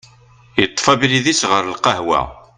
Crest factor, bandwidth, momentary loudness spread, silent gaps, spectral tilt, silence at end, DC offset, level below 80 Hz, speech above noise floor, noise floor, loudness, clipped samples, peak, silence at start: 18 dB; 11 kHz; 5 LU; none; -3 dB/octave; 0.2 s; under 0.1%; -46 dBFS; 31 dB; -47 dBFS; -16 LUFS; under 0.1%; 0 dBFS; 0.55 s